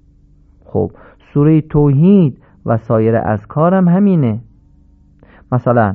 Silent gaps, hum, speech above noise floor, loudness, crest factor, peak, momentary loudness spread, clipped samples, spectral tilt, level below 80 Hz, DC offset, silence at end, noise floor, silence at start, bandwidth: none; none; 35 dB; -13 LUFS; 14 dB; 0 dBFS; 10 LU; under 0.1%; -12.5 dB/octave; -40 dBFS; under 0.1%; 0 s; -47 dBFS; 0.75 s; 3.4 kHz